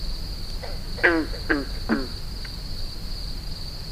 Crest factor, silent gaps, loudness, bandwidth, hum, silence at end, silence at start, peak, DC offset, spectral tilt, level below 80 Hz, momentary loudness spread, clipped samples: 22 dB; none; -28 LUFS; 16 kHz; none; 0 s; 0 s; -4 dBFS; under 0.1%; -5 dB/octave; -32 dBFS; 13 LU; under 0.1%